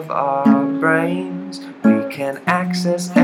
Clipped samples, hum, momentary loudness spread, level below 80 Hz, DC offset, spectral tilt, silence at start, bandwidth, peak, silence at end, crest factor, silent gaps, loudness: under 0.1%; none; 10 LU; -70 dBFS; under 0.1%; -6 dB/octave; 0 s; 13.5 kHz; 0 dBFS; 0 s; 18 dB; none; -18 LUFS